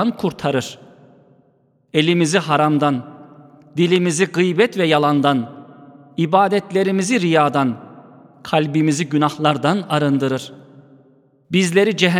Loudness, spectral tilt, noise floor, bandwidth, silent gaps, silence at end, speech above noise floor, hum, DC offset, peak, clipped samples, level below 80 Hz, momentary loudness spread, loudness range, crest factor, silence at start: -17 LUFS; -5.5 dB/octave; -59 dBFS; 14.5 kHz; none; 0 s; 42 dB; none; under 0.1%; 0 dBFS; under 0.1%; -64 dBFS; 10 LU; 2 LU; 18 dB; 0 s